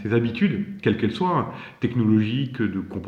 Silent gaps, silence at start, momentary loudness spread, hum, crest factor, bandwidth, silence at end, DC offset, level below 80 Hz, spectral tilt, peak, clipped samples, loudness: none; 0 s; 6 LU; none; 16 dB; 6.8 kHz; 0 s; under 0.1%; -56 dBFS; -8.5 dB/octave; -6 dBFS; under 0.1%; -23 LUFS